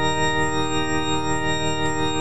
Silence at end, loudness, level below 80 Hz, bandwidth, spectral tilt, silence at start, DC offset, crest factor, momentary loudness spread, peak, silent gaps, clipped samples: 0 s; -22 LUFS; -40 dBFS; 9.8 kHz; -4 dB/octave; 0 s; 5%; 12 dB; 2 LU; -10 dBFS; none; under 0.1%